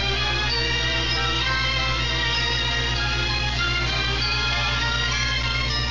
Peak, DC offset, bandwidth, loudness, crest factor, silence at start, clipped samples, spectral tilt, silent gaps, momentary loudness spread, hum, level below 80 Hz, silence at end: -10 dBFS; 0.7%; 7.6 kHz; -21 LUFS; 12 dB; 0 s; under 0.1%; -3 dB/octave; none; 1 LU; 60 Hz at -30 dBFS; -30 dBFS; 0 s